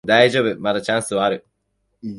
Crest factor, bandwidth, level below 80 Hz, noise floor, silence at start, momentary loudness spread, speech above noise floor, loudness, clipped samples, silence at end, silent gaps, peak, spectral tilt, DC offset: 18 dB; 11.5 kHz; -58 dBFS; -70 dBFS; 0.05 s; 12 LU; 52 dB; -18 LUFS; under 0.1%; 0 s; none; 0 dBFS; -4 dB/octave; under 0.1%